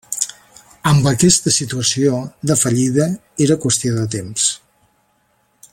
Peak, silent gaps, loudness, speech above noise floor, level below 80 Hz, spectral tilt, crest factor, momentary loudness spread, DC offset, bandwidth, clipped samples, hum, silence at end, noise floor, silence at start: 0 dBFS; none; -16 LUFS; 45 dB; -48 dBFS; -4 dB/octave; 18 dB; 9 LU; under 0.1%; 16.5 kHz; under 0.1%; none; 1.15 s; -61 dBFS; 0.1 s